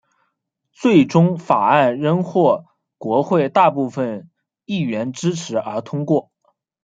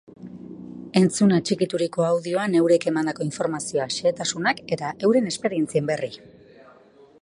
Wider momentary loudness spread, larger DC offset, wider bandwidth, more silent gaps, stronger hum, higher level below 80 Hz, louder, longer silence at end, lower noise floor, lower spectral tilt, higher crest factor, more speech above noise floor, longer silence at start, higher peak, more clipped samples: second, 11 LU vs 19 LU; neither; second, 7.8 kHz vs 11.5 kHz; neither; neither; about the same, -64 dBFS vs -66 dBFS; first, -18 LUFS vs -23 LUFS; second, 0.65 s vs 1.05 s; first, -73 dBFS vs -52 dBFS; first, -7 dB/octave vs -5 dB/octave; about the same, 18 dB vs 18 dB; first, 56 dB vs 30 dB; first, 0.8 s vs 0.2 s; first, 0 dBFS vs -4 dBFS; neither